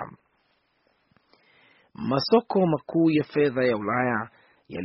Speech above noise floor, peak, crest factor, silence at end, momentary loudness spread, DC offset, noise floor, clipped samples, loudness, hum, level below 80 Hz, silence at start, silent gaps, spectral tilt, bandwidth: 46 dB; -6 dBFS; 20 dB; 0 s; 14 LU; under 0.1%; -69 dBFS; under 0.1%; -24 LUFS; none; -64 dBFS; 0 s; none; -5 dB/octave; 5.8 kHz